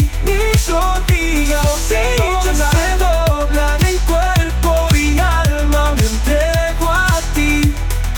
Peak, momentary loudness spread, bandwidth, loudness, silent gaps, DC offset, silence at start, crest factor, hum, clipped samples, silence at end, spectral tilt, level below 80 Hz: -2 dBFS; 2 LU; 19.5 kHz; -15 LUFS; none; under 0.1%; 0 s; 12 dB; none; under 0.1%; 0 s; -4.5 dB/octave; -16 dBFS